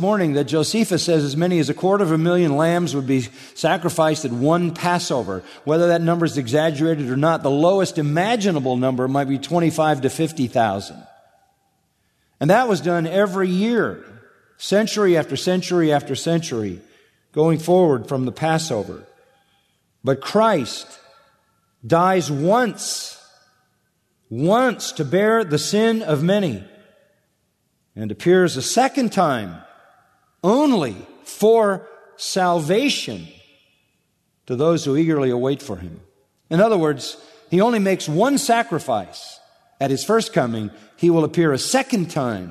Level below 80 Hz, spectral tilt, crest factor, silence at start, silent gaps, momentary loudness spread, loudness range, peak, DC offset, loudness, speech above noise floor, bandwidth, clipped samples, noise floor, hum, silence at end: -62 dBFS; -5.5 dB/octave; 18 dB; 0 s; none; 12 LU; 3 LU; -2 dBFS; under 0.1%; -19 LUFS; 49 dB; 13.5 kHz; under 0.1%; -68 dBFS; none; 0 s